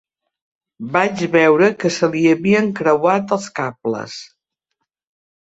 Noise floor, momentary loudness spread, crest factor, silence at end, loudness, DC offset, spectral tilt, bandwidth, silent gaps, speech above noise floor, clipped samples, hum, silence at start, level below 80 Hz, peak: -76 dBFS; 12 LU; 16 dB; 1.25 s; -17 LUFS; under 0.1%; -5.5 dB/octave; 8 kHz; none; 60 dB; under 0.1%; none; 0.8 s; -60 dBFS; -2 dBFS